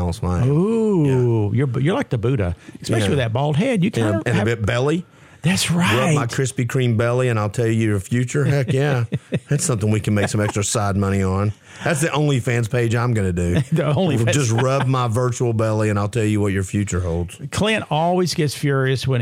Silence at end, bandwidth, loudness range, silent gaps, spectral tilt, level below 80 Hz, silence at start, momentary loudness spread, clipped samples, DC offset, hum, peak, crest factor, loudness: 0 s; 15.5 kHz; 1 LU; none; -6 dB/octave; -48 dBFS; 0 s; 5 LU; under 0.1%; under 0.1%; none; -4 dBFS; 14 dB; -19 LUFS